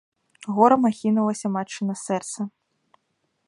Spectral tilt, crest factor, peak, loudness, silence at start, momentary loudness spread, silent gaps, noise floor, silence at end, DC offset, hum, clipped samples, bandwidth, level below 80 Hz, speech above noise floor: -6 dB/octave; 22 dB; -2 dBFS; -23 LUFS; 0.45 s; 15 LU; none; -73 dBFS; 1 s; under 0.1%; none; under 0.1%; 11.5 kHz; -72 dBFS; 51 dB